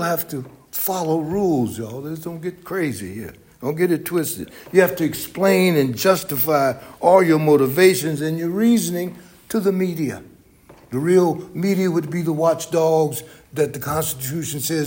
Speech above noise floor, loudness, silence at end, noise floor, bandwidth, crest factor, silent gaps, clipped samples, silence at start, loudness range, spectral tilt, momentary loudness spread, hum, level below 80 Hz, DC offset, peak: 29 dB; -20 LUFS; 0 s; -49 dBFS; 17 kHz; 18 dB; none; under 0.1%; 0 s; 7 LU; -5.5 dB/octave; 14 LU; none; -56 dBFS; under 0.1%; 0 dBFS